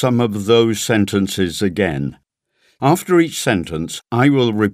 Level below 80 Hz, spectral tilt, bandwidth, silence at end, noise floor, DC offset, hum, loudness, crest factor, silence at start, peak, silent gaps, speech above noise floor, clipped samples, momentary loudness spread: -48 dBFS; -5.5 dB/octave; 16 kHz; 0 s; -62 dBFS; under 0.1%; none; -17 LUFS; 16 dB; 0 s; 0 dBFS; none; 46 dB; under 0.1%; 8 LU